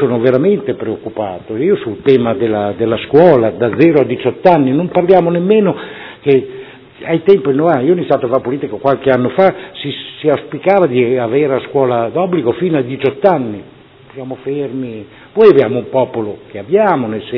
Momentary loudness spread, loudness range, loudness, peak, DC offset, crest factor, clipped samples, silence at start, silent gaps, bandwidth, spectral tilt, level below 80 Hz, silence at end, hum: 13 LU; 4 LU; -13 LUFS; 0 dBFS; under 0.1%; 12 dB; 0.6%; 0 s; none; 5.4 kHz; -10 dB/octave; -52 dBFS; 0 s; none